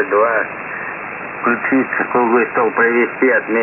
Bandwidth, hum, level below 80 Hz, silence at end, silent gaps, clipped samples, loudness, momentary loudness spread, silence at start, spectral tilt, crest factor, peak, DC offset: 3.2 kHz; none; -60 dBFS; 0 s; none; under 0.1%; -16 LUFS; 10 LU; 0 s; -9.5 dB/octave; 14 dB; -2 dBFS; under 0.1%